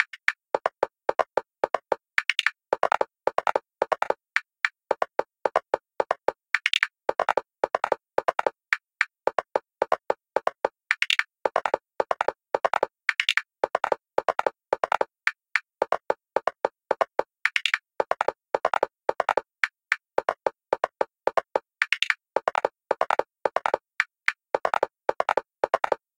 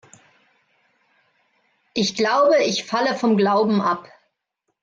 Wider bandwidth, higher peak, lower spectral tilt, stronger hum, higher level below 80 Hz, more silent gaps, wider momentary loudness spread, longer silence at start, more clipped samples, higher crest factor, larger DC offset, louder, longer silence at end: first, 16.5 kHz vs 7.8 kHz; first, -2 dBFS vs -8 dBFS; second, -1.5 dB/octave vs -4.5 dB/octave; neither; about the same, -66 dBFS vs -68 dBFS; neither; second, 5 LU vs 8 LU; second, 0 s vs 1.95 s; neither; first, 26 dB vs 14 dB; neither; second, -27 LUFS vs -19 LUFS; second, 0.25 s vs 0.8 s